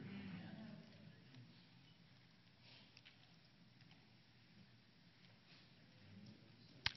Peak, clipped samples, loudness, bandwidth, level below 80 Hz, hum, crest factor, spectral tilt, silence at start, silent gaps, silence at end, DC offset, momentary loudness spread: -18 dBFS; under 0.1%; -60 LUFS; 6 kHz; -78 dBFS; none; 40 dB; -2.5 dB/octave; 0 s; none; 0 s; under 0.1%; 14 LU